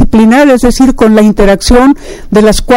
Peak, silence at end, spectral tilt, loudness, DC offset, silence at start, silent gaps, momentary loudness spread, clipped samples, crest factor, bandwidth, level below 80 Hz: 0 dBFS; 0 s; -5.5 dB/octave; -6 LUFS; under 0.1%; 0 s; none; 4 LU; 5%; 4 dB; 16.5 kHz; -16 dBFS